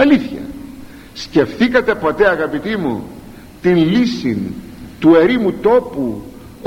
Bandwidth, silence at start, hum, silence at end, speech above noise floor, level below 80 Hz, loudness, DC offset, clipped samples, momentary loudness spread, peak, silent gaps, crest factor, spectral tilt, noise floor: 16 kHz; 0 s; none; 0 s; 22 dB; -42 dBFS; -15 LUFS; under 0.1%; under 0.1%; 22 LU; 0 dBFS; none; 16 dB; -7 dB/octave; -36 dBFS